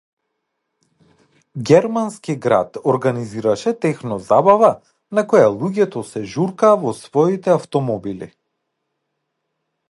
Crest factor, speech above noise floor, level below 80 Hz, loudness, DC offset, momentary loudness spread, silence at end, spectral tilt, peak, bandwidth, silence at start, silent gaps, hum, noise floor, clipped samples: 18 dB; 58 dB; -60 dBFS; -17 LUFS; under 0.1%; 12 LU; 1.65 s; -7 dB/octave; 0 dBFS; 11.5 kHz; 1.55 s; none; none; -75 dBFS; under 0.1%